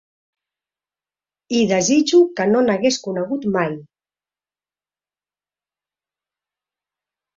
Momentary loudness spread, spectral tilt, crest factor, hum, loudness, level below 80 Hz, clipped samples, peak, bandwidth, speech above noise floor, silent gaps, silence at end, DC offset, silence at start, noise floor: 9 LU; -4.5 dB/octave; 18 dB; 50 Hz at -50 dBFS; -18 LUFS; -64 dBFS; under 0.1%; -4 dBFS; 7.8 kHz; over 73 dB; none; 3.5 s; under 0.1%; 1.5 s; under -90 dBFS